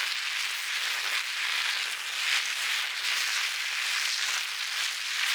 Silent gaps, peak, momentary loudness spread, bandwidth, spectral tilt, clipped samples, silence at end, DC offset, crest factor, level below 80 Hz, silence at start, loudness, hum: none; -12 dBFS; 3 LU; over 20 kHz; 5 dB/octave; under 0.1%; 0 s; under 0.1%; 18 dB; -88 dBFS; 0 s; -27 LUFS; none